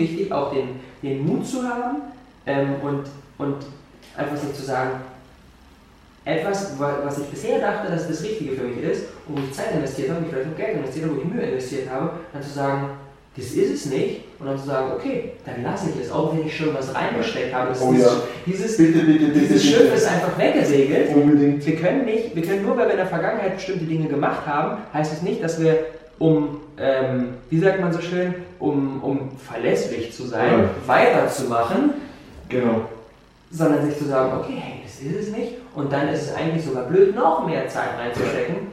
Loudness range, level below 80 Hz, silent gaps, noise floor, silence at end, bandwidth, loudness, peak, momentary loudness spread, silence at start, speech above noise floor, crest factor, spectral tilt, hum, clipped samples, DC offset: 9 LU; -54 dBFS; none; -50 dBFS; 0 s; 14.5 kHz; -22 LUFS; 0 dBFS; 13 LU; 0 s; 29 dB; 20 dB; -6 dB/octave; none; under 0.1%; under 0.1%